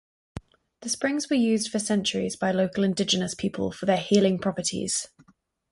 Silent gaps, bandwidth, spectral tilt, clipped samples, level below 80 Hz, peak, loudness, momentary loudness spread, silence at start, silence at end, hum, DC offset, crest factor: none; 11.5 kHz; -4 dB/octave; under 0.1%; -58 dBFS; -8 dBFS; -25 LUFS; 17 LU; 0.35 s; 0.65 s; none; under 0.1%; 18 dB